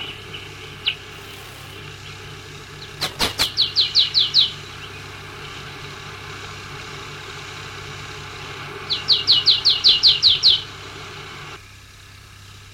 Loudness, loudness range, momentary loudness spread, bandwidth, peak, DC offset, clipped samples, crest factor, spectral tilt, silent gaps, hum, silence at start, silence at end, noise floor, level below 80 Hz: -15 LUFS; 18 LU; 23 LU; 17 kHz; -4 dBFS; under 0.1%; under 0.1%; 20 dB; -1.5 dB/octave; none; none; 0 s; 0 s; -43 dBFS; -48 dBFS